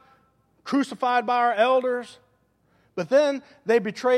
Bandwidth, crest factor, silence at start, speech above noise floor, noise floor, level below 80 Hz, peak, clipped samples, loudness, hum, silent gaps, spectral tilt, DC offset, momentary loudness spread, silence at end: 12 kHz; 16 dB; 0.65 s; 43 dB; -65 dBFS; -76 dBFS; -8 dBFS; under 0.1%; -23 LUFS; none; none; -5 dB/octave; under 0.1%; 13 LU; 0 s